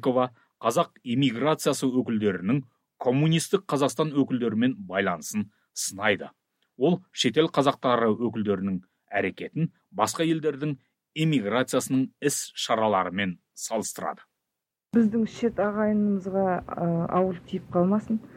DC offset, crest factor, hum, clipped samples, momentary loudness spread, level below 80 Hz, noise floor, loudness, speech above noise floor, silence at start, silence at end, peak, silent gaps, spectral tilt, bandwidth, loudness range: under 0.1%; 18 dB; none; under 0.1%; 8 LU; -64 dBFS; -86 dBFS; -26 LUFS; 60 dB; 0 s; 0 s; -8 dBFS; none; -5 dB/octave; 16.5 kHz; 2 LU